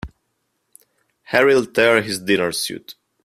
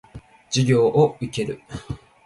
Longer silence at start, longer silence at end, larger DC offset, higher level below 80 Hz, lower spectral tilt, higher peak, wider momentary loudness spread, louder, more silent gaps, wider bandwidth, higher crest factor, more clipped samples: about the same, 0.05 s vs 0.15 s; about the same, 0.35 s vs 0.3 s; neither; about the same, -50 dBFS vs -48 dBFS; second, -3.5 dB/octave vs -6 dB/octave; first, 0 dBFS vs -6 dBFS; second, 13 LU vs 17 LU; first, -17 LUFS vs -21 LUFS; neither; first, 15 kHz vs 11.5 kHz; about the same, 20 dB vs 16 dB; neither